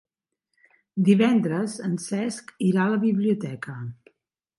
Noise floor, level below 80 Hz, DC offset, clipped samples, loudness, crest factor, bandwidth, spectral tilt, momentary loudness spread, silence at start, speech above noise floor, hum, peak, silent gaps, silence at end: -81 dBFS; -72 dBFS; under 0.1%; under 0.1%; -24 LUFS; 18 dB; 11.5 kHz; -6.5 dB/octave; 16 LU; 0.95 s; 58 dB; none; -8 dBFS; none; 0.65 s